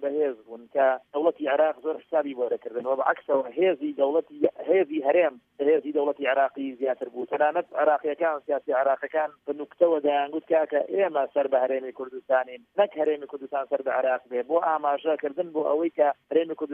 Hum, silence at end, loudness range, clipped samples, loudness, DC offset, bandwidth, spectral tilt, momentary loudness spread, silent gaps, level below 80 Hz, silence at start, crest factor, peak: none; 0 s; 2 LU; under 0.1%; -26 LUFS; under 0.1%; 3.7 kHz; -7.5 dB/octave; 7 LU; none; -82 dBFS; 0 s; 18 dB; -6 dBFS